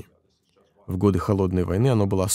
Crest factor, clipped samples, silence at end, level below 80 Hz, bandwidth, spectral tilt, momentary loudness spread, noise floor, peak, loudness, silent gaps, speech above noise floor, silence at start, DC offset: 16 dB; under 0.1%; 0 s; -46 dBFS; 15.5 kHz; -6.5 dB/octave; 3 LU; -64 dBFS; -6 dBFS; -22 LUFS; none; 43 dB; 0.9 s; under 0.1%